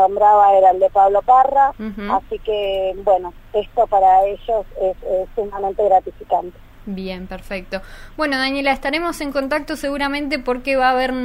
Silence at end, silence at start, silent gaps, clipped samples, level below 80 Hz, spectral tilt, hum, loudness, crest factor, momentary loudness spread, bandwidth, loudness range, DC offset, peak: 0 s; 0 s; none; under 0.1%; -40 dBFS; -4.5 dB/octave; none; -17 LUFS; 14 dB; 15 LU; 16 kHz; 7 LU; under 0.1%; -2 dBFS